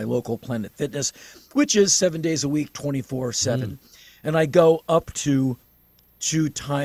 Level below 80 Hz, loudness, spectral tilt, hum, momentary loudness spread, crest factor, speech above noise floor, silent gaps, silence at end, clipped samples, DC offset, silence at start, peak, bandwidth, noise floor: -54 dBFS; -22 LUFS; -4.5 dB/octave; none; 12 LU; 20 dB; 35 dB; none; 0 s; under 0.1%; under 0.1%; 0 s; -4 dBFS; 15 kHz; -58 dBFS